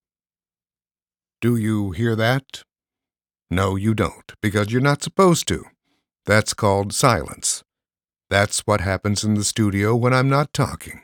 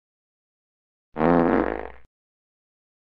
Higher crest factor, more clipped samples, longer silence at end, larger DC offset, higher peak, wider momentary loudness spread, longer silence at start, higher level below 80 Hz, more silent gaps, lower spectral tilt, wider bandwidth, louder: about the same, 22 dB vs 22 dB; neither; second, 0.05 s vs 1.1 s; neither; first, 0 dBFS vs -4 dBFS; second, 8 LU vs 21 LU; first, 1.4 s vs 1.15 s; about the same, -50 dBFS vs -46 dBFS; neither; second, -5 dB/octave vs -10 dB/octave; first, 18.5 kHz vs 5.2 kHz; about the same, -20 LUFS vs -22 LUFS